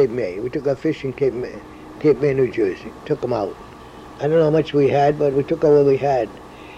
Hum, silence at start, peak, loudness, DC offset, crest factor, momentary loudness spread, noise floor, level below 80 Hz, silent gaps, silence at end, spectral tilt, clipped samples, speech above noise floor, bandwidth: none; 0 s; -4 dBFS; -19 LUFS; under 0.1%; 14 dB; 20 LU; -39 dBFS; -48 dBFS; none; 0 s; -8 dB/octave; under 0.1%; 20 dB; 8.6 kHz